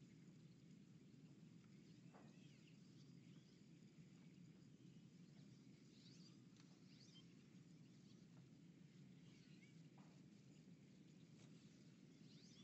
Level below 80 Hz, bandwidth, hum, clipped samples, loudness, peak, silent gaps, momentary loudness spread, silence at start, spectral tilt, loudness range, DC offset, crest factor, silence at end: under -90 dBFS; 8 kHz; none; under 0.1%; -67 LUFS; -54 dBFS; none; 2 LU; 0 s; -6 dB/octave; 0 LU; under 0.1%; 12 dB; 0 s